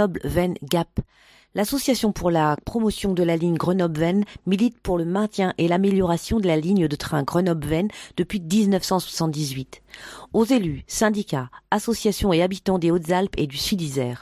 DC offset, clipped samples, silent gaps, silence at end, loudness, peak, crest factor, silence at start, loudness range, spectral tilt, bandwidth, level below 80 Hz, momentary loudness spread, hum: under 0.1%; under 0.1%; none; 0 s; -23 LUFS; -4 dBFS; 18 dB; 0 s; 2 LU; -5.5 dB/octave; 16 kHz; -42 dBFS; 7 LU; none